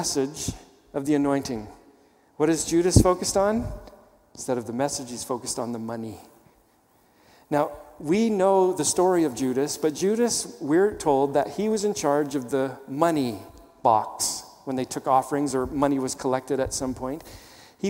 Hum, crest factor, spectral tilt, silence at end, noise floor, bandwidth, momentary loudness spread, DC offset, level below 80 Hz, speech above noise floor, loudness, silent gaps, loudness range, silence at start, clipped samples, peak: none; 24 dB; -5 dB/octave; 0 s; -61 dBFS; 16.5 kHz; 13 LU; under 0.1%; -44 dBFS; 37 dB; -25 LUFS; none; 8 LU; 0 s; under 0.1%; -2 dBFS